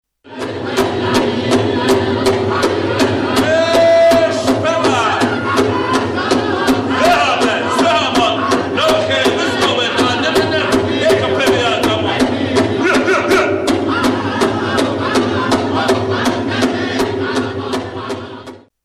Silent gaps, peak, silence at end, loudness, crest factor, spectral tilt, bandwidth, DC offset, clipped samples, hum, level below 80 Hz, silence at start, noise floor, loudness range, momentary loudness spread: none; -2 dBFS; 0.25 s; -14 LUFS; 12 dB; -4.5 dB/octave; 15 kHz; under 0.1%; under 0.1%; none; -44 dBFS; 0.25 s; -34 dBFS; 3 LU; 5 LU